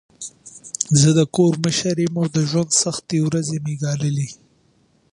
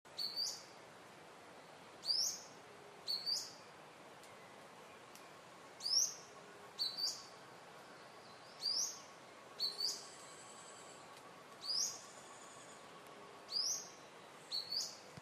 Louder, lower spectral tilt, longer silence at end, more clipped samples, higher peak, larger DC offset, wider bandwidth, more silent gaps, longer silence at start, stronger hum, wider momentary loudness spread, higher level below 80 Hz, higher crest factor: first, -19 LUFS vs -39 LUFS; first, -5 dB/octave vs 0.5 dB/octave; first, 0.8 s vs 0 s; neither; first, 0 dBFS vs -22 dBFS; neither; second, 11.5 kHz vs 14 kHz; neither; first, 0.2 s vs 0.05 s; neither; second, 16 LU vs 20 LU; first, -56 dBFS vs under -90 dBFS; about the same, 20 dB vs 24 dB